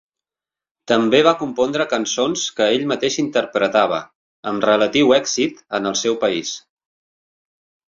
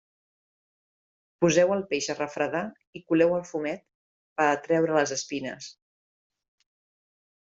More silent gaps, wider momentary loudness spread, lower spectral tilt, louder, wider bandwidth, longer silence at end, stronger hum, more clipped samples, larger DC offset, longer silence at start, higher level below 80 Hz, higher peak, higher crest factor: second, 4.15-4.43 s vs 2.87-2.93 s, 3.95-4.36 s; second, 9 LU vs 15 LU; second, -3 dB/octave vs -4.5 dB/octave; first, -18 LUFS vs -26 LUFS; about the same, 7.6 kHz vs 7.8 kHz; second, 1.35 s vs 1.7 s; neither; neither; neither; second, 0.9 s vs 1.4 s; first, -60 dBFS vs -70 dBFS; first, -2 dBFS vs -8 dBFS; about the same, 18 dB vs 20 dB